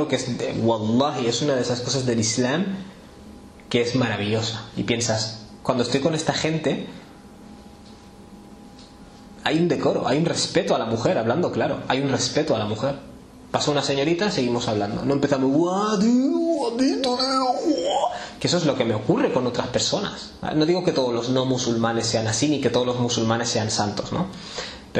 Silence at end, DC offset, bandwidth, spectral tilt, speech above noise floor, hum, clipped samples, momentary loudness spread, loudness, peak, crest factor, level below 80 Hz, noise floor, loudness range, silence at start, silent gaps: 0 s; under 0.1%; 11 kHz; -4.5 dB/octave; 22 dB; none; under 0.1%; 7 LU; -22 LUFS; -6 dBFS; 16 dB; -52 dBFS; -44 dBFS; 5 LU; 0 s; none